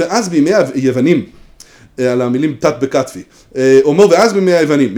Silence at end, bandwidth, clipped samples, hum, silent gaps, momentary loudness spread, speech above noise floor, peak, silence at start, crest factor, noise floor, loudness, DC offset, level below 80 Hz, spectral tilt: 0 s; 17.5 kHz; 0.2%; none; none; 10 LU; 30 dB; 0 dBFS; 0 s; 12 dB; -41 dBFS; -12 LUFS; under 0.1%; -50 dBFS; -5.5 dB/octave